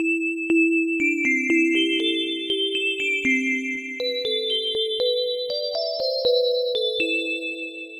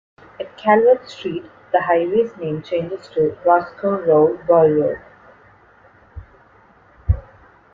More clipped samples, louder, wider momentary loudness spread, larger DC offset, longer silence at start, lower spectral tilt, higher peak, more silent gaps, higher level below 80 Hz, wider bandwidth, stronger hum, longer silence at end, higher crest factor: neither; second, -22 LUFS vs -18 LUFS; second, 6 LU vs 14 LU; neither; second, 0 s vs 0.4 s; second, -2 dB/octave vs -8.5 dB/octave; second, -10 dBFS vs -2 dBFS; neither; second, -66 dBFS vs -38 dBFS; first, 12.5 kHz vs 7.2 kHz; neither; second, 0 s vs 0.55 s; about the same, 14 dB vs 18 dB